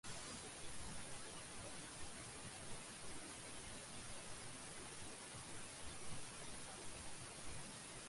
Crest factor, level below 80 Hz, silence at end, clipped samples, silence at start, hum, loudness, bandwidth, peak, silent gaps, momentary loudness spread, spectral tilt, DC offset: 14 dB; -66 dBFS; 0 s; under 0.1%; 0.05 s; none; -52 LUFS; 11.5 kHz; -36 dBFS; none; 1 LU; -2.5 dB/octave; under 0.1%